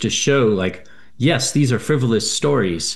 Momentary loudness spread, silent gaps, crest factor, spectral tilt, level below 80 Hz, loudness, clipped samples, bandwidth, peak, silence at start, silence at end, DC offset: 4 LU; none; 16 dB; -4.5 dB/octave; -52 dBFS; -18 LUFS; under 0.1%; 12.5 kHz; -2 dBFS; 0 s; 0 s; 1%